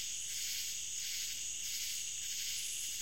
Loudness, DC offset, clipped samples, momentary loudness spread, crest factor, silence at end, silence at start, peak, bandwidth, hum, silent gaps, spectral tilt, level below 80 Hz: -37 LUFS; 0.3%; under 0.1%; 1 LU; 14 dB; 0 s; 0 s; -26 dBFS; 16.5 kHz; none; none; 3 dB/octave; -70 dBFS